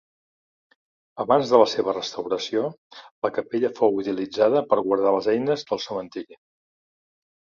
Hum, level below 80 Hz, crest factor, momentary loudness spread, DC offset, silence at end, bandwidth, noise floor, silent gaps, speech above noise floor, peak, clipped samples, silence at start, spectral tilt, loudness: none; -68 dBFS; 22 dB; 13 LU; under 0.1%; 1.25 s; 7.4 kHz; under -90 dBFS; 2.78-2.90 s, 3.11-3.22 s; over 67 dB; -2 dBFS; under 0.1%; 1.15 s; -5.5 dB/octave; -23 LUFS